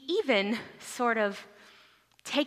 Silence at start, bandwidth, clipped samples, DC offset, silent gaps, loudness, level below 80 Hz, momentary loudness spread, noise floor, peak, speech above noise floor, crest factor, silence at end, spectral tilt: 0 s; 15.5 kHz; under 0.1%; under 0.1%; none; -29 LUFS; -80 dBFS; 16 LU; -61 dBFS; -12 dBFS; 31 dB; 20 dB; 0 s; -3.5 dB/octave